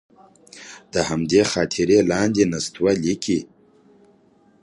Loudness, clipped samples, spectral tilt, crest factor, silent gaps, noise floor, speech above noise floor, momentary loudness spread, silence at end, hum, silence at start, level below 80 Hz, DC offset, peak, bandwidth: -20 LUFS; under 0.1%; -4.5 dB/octave; 18 dB; none; -56 dBFS; 36 dB; 10 LU; 1.2 s; none; 0.55 s; -50 dBFS; under 0.1%; -4 dBFS; 11.5 kHz